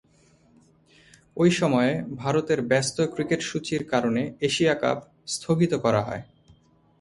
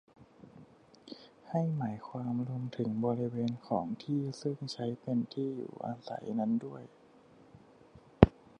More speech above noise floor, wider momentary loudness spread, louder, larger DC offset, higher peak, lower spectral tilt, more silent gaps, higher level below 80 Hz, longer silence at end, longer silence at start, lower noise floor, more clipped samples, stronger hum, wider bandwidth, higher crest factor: first, 36 dB vs 25 dB; second, 10 LU vs 18 LU; first, -24 LUFS vs -34 LUFS; neither; second, -6 dBFS vs -2 dBFS; second, -5 dB/octave vs -8 dB/octave; neither; second, -60 dBFS vs -50 dBFS; first, 0.8 s vs 0.3 s; first, 1.35 s vs 0.2 s; about the same, -59 dBFS vs -60 dBFS; neither; neither; first, 11.5 kHz vs 10 kHz; second, 18 dB vs 34 dB